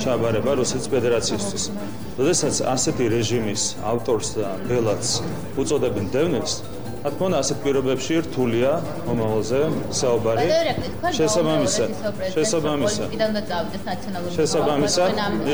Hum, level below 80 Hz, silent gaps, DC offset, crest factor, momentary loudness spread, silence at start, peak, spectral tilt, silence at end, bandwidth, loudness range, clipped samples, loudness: none; -46 dBFS; none; 2%; 12 dB; 7 LU; 0 s; -8 dBFS; -4.5 dB/octave; 0 s; over 20 kHz; 2 LU; under 0.1%; -22 LUFS